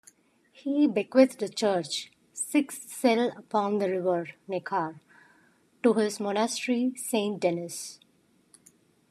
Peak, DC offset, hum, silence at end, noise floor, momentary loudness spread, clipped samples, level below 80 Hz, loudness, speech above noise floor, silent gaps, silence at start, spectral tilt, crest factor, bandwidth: -6 dBFS; under 0.1%; none; 1.15 s; -66 dBFS; 11 LU; under 0.1%; -84 dBFS; -28 LUFS; 39 dB; none; 0.65 s; -4.5 dB/octave; 22 dB; 14 kHz